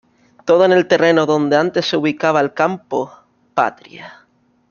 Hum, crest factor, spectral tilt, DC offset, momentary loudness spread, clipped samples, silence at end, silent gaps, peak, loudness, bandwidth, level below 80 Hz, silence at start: none; 16 dB; -5.5 dB/octave; under 0.1%; 16 LU; under 0.1%; 0.6 s; none; 0 dBFS; -16 LUFS; 7.2 kHz; -62 dBFS; 0.45 s